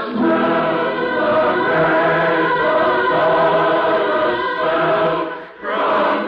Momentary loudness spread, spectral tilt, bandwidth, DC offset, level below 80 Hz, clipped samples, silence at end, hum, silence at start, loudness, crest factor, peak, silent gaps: 4 LU; -7.5 dB/octave; 5.4 kHz; under 0.1%; -52 dBFS; under 0.1%; 0 s; none; 0 s; -16 LUFS; 10 dB; -6 dBFS; none